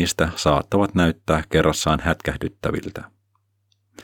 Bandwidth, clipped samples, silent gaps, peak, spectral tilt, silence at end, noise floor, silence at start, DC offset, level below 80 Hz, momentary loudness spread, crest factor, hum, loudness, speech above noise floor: 19 kHz; under 0.1%; none; -4 dBFS; -5 dB/octave; 0 s; -68 dBFS; 0 s; under 0.1%; -40 dBFS; 9 LU; 18 dB; none; -21 LUFS; 47 dB